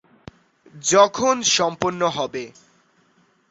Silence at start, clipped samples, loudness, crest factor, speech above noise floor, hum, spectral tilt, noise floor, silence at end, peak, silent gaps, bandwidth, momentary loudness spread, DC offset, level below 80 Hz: 0.75 s; under 0.1%; -19 LUFS; 20 dB; 41 dB; none; -2.5 dB/octave; -61 dBFS; 1 s; -2 dBFS; none; 8.4 kHz; 13 LU; under 0.1%; -60 dBFS